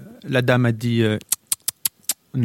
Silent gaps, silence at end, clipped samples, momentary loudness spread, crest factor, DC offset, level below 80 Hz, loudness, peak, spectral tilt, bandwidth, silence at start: none; 0 s; under 0.1%; 6 LU; 20 dB; under 0.1%; -58 dBFS; -21 LUFS; 0 dBFS; -4.5 dB/octave; 17 kHz; 0 s